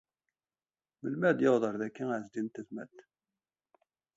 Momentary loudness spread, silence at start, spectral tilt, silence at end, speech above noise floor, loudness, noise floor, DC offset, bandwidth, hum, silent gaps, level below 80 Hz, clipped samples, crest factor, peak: 17 LU; 1.05 s; -7 dB/octave; 1.15 s; over 58 dB; -32 LUFS; under -90 dBFS; under 0.1%; 7.8 kHz; none; none; -80 dBFS; under 0.1%; 22 dB; -12 dBFS